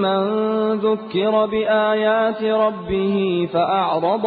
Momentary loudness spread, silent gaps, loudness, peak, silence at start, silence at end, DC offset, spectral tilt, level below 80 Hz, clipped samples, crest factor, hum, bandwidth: 3 LU; none; -19 LUFS; -6 dBFS; 0 s; 0 s; under 0.1%; -4 dB/octave; -52 dBFS; under 0.1%; 12 dB; none; 4.9 kHz